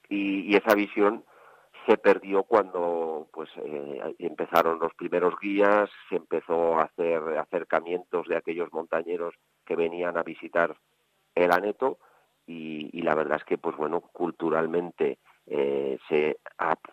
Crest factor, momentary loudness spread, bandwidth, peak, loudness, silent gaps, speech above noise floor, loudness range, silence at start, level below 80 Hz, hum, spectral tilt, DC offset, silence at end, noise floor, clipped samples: 22 dB; 12 LU; 13.5 kHz; -6 dBFS; -27 LUFS; none; 26 dB; 4 LU; 0.1 s; -72 dBFS; none; -6 dB/octave; under 0.1%; 0.15 s; -53 dBFS; under 0.1%